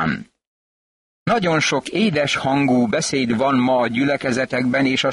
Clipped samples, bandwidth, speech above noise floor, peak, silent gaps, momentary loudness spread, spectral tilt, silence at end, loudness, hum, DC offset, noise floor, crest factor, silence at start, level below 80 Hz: under 0.1%; 11.5 kHz; over 72 dB; -8 dBFS; 0.47-1.26 s; 4 LU; -4.5 dB/octave; 0 s; -18 LUFS; none; under 0.1%; under -90 dBFS; 12 dB; 0 s; -54 dBFS